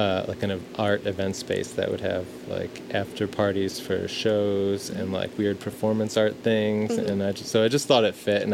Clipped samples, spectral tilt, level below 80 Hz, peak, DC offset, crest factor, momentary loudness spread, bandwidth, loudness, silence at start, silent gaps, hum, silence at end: under 0.1%; -5 dB/octave; -64 dBFS; -6 dBFS; under 0.1%; 18 dB; 7 LU; 16.5 kHz; -26 LUFS; 0 s; none; none; 0 s